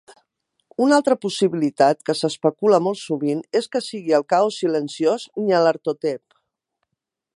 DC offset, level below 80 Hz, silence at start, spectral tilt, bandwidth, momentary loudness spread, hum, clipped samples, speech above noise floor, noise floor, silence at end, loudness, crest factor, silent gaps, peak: under 0.1%; -76 dBFS; 0.8 s; -5 dB/octave; 11.5 kHz; 7 LU; none; under 0.1%; 61 dB; -81 dBFS; 1.2 s; -20 LUFS; 18 dB; none; -2 dBFS